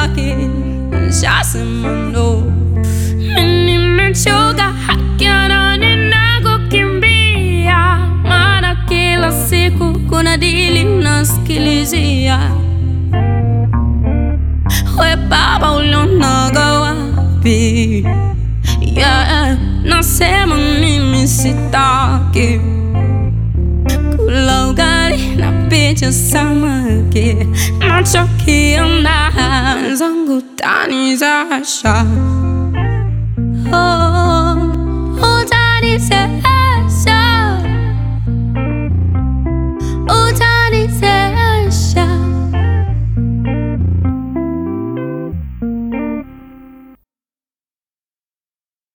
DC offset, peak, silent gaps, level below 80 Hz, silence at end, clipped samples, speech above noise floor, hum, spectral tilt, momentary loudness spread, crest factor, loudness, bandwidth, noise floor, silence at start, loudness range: under 0.1%; 0 dBFS; none; -20 dBFS; 2.3 s; under 0.1%; over 78 dB; none; -5 dB/octave; 7 LU; 12 dB; -12 LUFS; 17.5 kHz; under -90 dBFS; 0 s; 4 LU